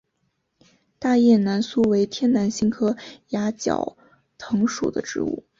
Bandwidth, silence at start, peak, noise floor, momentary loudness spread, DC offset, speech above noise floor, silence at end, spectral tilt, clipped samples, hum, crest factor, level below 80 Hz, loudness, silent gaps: 7.6 kHz; 1 s; -6 dBFS; -72 dBFS; 11 LU; under 0.1%; 51 dB; 0.2 s; -5.5 dB/octave; under 0.1%; none; 16 dB; -58 dBFS; -22 LUFS; none